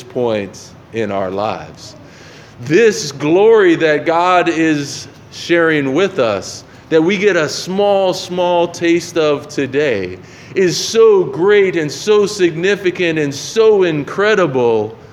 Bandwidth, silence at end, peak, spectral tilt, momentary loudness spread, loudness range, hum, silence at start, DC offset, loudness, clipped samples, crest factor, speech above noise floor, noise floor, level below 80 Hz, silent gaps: 13.5 kHz; 0.15 s; 0 dBFS; -4.5 dB/octave; 14 LU; 3 LU; none; 0 s; under 0.1%; -14 LUFS; under 0.1%; 14 dB; 24 dB; -38 dBFS; -56 dBFS; none